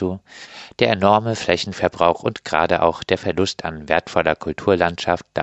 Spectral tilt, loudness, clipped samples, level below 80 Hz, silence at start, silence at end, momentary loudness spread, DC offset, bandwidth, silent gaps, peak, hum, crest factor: -5 dB/octave; -19 LUFS; under 0.1%; -48 dBFS; 0 s; 0 s; 10 LU; under 0.1%; 8.4 kHz; none; 0 dBFS; none; 20 dB